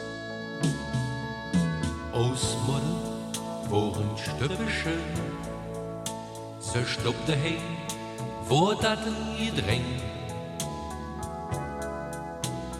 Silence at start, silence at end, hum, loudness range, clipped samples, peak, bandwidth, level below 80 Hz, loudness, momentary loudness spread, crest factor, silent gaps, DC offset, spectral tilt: 0 s; 0 s; none; 3 LU; under 0.1%; -10 dBFS; 16 kHz; -46 dBFS; -30 LUFS; 9 LU; 20 dB; none; under 0.1%; -5 dB/octave